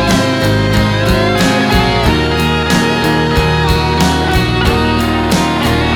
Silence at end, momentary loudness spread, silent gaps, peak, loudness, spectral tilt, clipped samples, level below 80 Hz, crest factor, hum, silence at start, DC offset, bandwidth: 0 s; 2 LU; none; 0 dBFS; -12 LUFS; -5 dB/octave; under 0.1%; -22 dBFS; 10 dB; none; 0 s; under 0.1%; 19 kHz